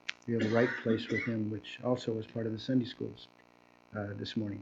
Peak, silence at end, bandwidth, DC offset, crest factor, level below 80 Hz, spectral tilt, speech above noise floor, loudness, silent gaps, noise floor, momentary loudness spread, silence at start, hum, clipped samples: -12 dBFS; 0 s; 7.8 kHz; under 0.1%; 22 dB; -70 dBFS; -6.5 dB/octave; 29 dB; -34 LUFS; none; -62 dBFS; 12 LU; 0.05 s; 60 Hz at -55 dBFS; under 0.1%